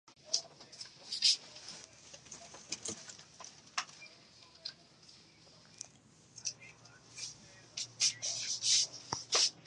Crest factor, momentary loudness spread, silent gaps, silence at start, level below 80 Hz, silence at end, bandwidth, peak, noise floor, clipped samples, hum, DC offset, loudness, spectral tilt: 26 dB; 24 LU; none; 0.25 s; -78 dBFS; 0.05 s; 11.5 kHz; -14 dBFS; -63 dBFS; under 0.1%; none; under 0.1%; -34 LUFS; 1 dB/octave